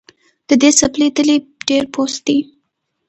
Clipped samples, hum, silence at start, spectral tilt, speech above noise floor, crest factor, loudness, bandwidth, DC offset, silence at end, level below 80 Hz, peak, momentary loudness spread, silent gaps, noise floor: under 0.1%; none; 0.5 s; -2 dB/octave; 56 dB; 16 dB; -14 LUFS; 9 kHz; under 0.1%; 0.65 s; -52 dBFS; 0 dBFS; 9 LU; none; -70 dBFS